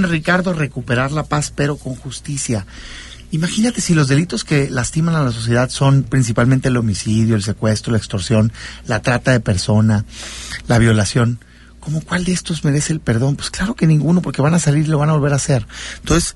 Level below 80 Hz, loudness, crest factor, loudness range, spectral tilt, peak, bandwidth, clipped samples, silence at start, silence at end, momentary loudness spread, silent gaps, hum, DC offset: -36 dBFS; -17 LUFS; 14 dB; 3 LU; -5.5 dB/octave; -2 dBFS; 11.5 kHz; under 0.1%; 0 s; 0.05 s; 11 LU; none; none; under 0.1%